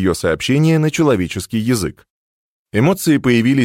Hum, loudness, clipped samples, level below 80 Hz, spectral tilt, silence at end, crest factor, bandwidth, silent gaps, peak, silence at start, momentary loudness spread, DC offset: none; -16 LUFS; under 0.1%; -44 dBFS; -6 dB/octave; 0 s; 14 dB; 16.5 kHz; 2.10-2.65 s; -2 dBFS; 0 s; 7 LU; under 0.1%